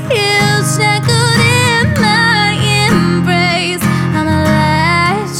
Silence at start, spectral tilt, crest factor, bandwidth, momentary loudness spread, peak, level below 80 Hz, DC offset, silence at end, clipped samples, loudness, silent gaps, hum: 0 s; -4.5 dB/octave; 12 dB; 16 kHz; 4 LU; 0 dBFS; -36 dBFS; under 0.1%; 0 s; under 0.1%; -11 LUFS; none; none